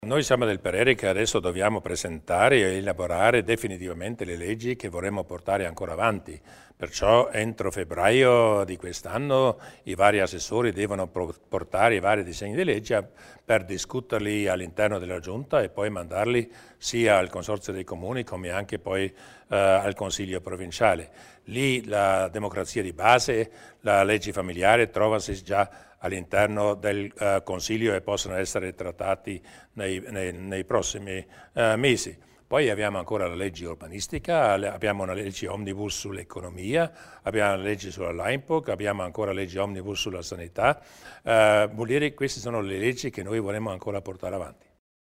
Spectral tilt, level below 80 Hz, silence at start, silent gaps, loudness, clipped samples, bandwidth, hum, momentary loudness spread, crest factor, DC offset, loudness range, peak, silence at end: -4.5 dB/octave; -52 dBFS; 0 s; none; -26 LUFS; under 0.1%; 16 kHz; none; 13 LU; 22 dB; under 0.1%; 5 LU; -4 dBFS; 0.65 s